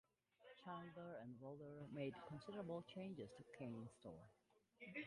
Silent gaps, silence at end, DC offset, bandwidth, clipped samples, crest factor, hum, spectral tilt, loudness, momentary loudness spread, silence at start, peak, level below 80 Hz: none; 0 s; under 0.1%; 11 kHz; under 0.1%; 18 dB; none; -7 dB/octave; -55 LUFS; 10 LU; 0.4 s; -38 dBFS; -84 dBFS